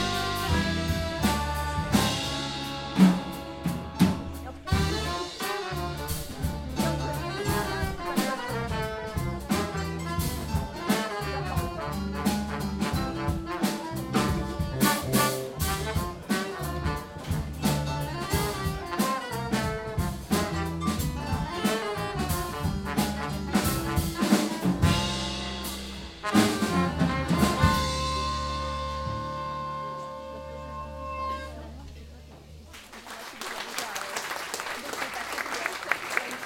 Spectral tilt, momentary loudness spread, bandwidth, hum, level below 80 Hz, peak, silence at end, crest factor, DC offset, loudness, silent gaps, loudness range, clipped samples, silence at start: -5 dB/octave; 11 LU; 17 kHz; none; -40 dBFS; -6 dBFS; 0 s; 22 dB; under 0.1%; -29 LUFS; none; 8 LU; under 0.1%; 0 s